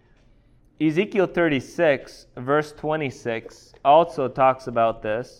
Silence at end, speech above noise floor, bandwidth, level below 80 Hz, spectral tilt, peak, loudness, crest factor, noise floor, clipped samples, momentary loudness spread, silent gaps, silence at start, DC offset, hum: 0.15 s; 34 dB; 11.5 kHz; -54 dBFS; -6.5 dB/octave; -4 dBFS; -22 LUFS; 18 dB; -56 dBFS; under 0.1%; 12 LU; none; 0.8 s; under 0.1%; none